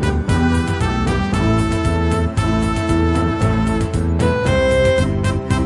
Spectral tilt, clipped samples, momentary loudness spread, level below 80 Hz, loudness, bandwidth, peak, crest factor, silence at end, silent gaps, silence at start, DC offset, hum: -6.5 dB/octave; under 0.1%; 4 LU; -26 dBFS; -17 LUFS; 11.5 kHz; -2 dBFS; 14 dB; 0 s; none; 0 s; under 0.1%; none